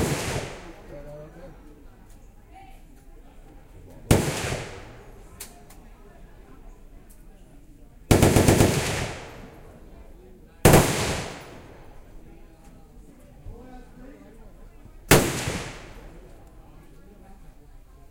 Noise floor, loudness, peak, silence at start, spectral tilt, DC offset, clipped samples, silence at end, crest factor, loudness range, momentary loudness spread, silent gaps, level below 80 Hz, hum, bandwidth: -48 dBFS; -22 LUFS; -2 dBFS; 0 s; -4.5 dB/octave; under 0.1%; under 0.1%; 0.3 s; 26 dB; 14 LU; 29 LU; none; -38 dBFS; none; 16 kHz